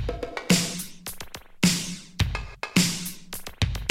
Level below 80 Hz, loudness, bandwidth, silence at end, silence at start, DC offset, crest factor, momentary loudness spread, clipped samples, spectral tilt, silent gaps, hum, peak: -38 dBFS; -26 LUFS; 16.5 kHz; 0 s; 0 s; under 0.1%; 22 dB; 15 LU; under 0.1%; -3.5 dB/octave; none; none; -4 dBFS